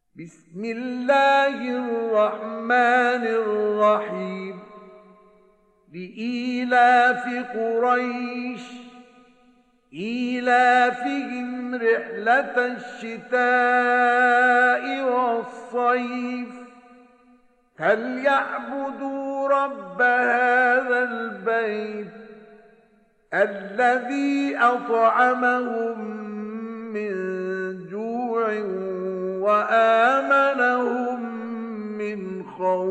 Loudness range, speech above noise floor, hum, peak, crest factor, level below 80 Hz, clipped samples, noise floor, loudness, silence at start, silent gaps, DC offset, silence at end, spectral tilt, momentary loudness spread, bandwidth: 6 LU; 39 dB; none; -8 dBFS; 16 dB; -72 dBFS; under 0.1%; -60 dBFS; -22 LUFS; 0.15 s; none; under 0.1%; 0 s; -5 dB/octave; 15 LU; 8.8 kHz